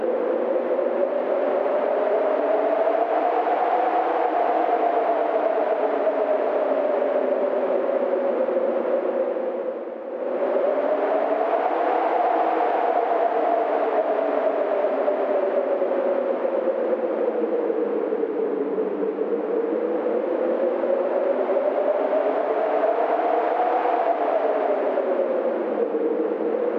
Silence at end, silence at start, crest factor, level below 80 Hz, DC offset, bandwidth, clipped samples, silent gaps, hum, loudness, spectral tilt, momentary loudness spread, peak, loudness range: 0 s; 0 s; 12 dB; under -90 dBFS; under 0.1%; 5.6 kHz; under 0.1%; none; none; -23 LUFS; -7 dB/octave; 3 LU; -10 dBFS; 2 LU